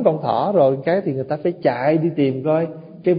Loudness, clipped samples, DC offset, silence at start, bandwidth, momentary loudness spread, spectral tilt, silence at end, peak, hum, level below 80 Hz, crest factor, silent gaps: -19 LUFS; under 0.1%; under 0.1%; 0 s; 5.2 kHz; 7 LU; -12.5 dB/octave; 0 s; -2 dBFS; none; -62 dBFS; 16 dB; none